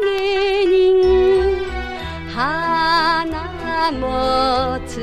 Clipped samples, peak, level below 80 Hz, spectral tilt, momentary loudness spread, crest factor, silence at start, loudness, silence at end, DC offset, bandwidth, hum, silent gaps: under 0.1%; -4 dBFS; -34 dBFS; -5.5 dB/octave; 12 LU; 12 dB; 0 s; -17 LUFS; 0 s; under 0.1%; 10.5 kHz; none; none